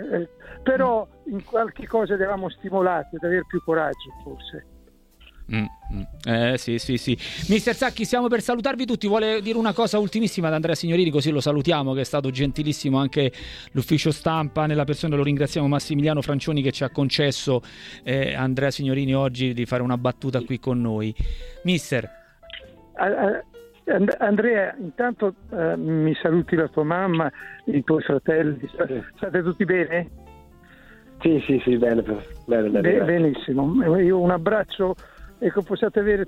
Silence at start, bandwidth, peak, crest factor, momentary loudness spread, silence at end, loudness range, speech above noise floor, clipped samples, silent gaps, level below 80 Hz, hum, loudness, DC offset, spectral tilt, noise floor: 0 s; 15 kHz; -4 dBFS; 18 dB; 9 LU; 0 s; 5 LU; 30 dB; under 0.1%; none; -44 dBFS; none; -23 LUFS; under 0.1%; -6.5 dB/octave; -52 dBFS